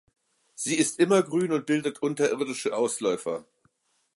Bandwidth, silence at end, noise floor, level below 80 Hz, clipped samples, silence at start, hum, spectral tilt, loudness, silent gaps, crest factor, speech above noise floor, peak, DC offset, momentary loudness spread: 11.5 kHz; 0.75 s; -69 dBFS; -78 dBFS; under 0.1%; 0.6 s; none; -4 dB/octave; -26 LUFS; none; 18 dB; 43 dB; -8 dBFS; under 0.1%; 9 LU